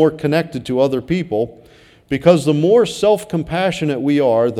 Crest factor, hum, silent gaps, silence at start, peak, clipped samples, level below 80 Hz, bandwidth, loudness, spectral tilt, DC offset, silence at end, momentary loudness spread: 16 dB; none; none; 0 s; 0 dBFS; under 0.1%; -48 dBFS; 15 kHz; -16 LUFS; -6.5 dB/octave; under 0.1%; 0 s; 8 LU